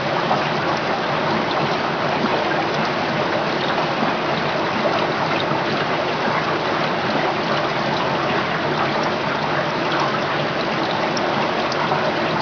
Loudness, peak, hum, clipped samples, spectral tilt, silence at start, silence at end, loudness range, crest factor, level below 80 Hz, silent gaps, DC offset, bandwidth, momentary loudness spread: -20 LUFS; -6 dBFS; none; under 0.1%; -5 dB/octave; 0 s; 0 s; 0 LU; 14 dB; -54 dBFS; none; 0.1%; 5.4 kHz; 1 LU